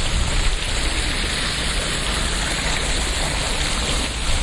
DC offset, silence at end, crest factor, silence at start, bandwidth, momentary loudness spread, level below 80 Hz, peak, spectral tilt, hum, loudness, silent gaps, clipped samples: under 0.1%; 0 s; 14 dB; 0 s; 11.5 kHz; 1 LU; -24 dBFS; -8 dBFS; -2.5 dB/octave; none; -21 LUFS; none; under 0.1%